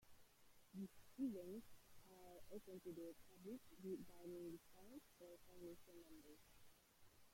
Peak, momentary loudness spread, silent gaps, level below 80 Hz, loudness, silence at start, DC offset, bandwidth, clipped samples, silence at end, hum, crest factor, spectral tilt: -38 dBFS; 14 LU; none; -80 dBFS; -57 LUFS; 0 s; under 0.1%; 16.5 kHz; under 0.1%; 0 s; none; 20 dB; -6 dB/octave